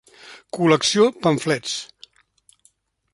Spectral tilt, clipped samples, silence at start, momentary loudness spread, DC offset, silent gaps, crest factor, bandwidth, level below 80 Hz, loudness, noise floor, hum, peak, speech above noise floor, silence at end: -4 dB/octave; under 0.1%; 0.25 s; 15 LU; under 0.1%; none; 20 dB; 11.5 kHz; -64 dBFS; -19 LUFS; -62 dBFS; none; -2 dBFS; 43 dB; 1.3 s